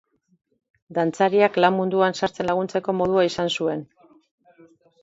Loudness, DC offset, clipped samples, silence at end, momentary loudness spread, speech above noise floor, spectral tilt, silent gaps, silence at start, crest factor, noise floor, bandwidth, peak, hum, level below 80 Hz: -22 LUFS; under 0.1%; under 0.1%; 1.2 s; 7 LU; 33 dB; -5.5 dB/octave; none; 0.9 s; 20 dB; -54 dBFS; 8 kHz; -4 dBFS; none; -62 dBFS